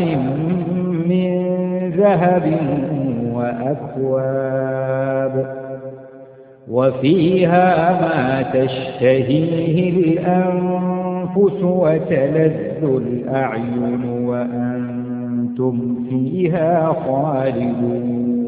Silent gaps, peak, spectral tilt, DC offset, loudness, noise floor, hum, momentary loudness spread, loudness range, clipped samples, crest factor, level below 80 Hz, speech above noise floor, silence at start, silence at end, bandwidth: none; 0 dBFS; -13 dB/octave; under 0.1%; -18 LUFS; -41 dBFS; none; 7 LU; 5 LU; under 0.1%; 18 dB; -52 dBFS; 24 dB; 0 s; 0 s; 4.8 kHz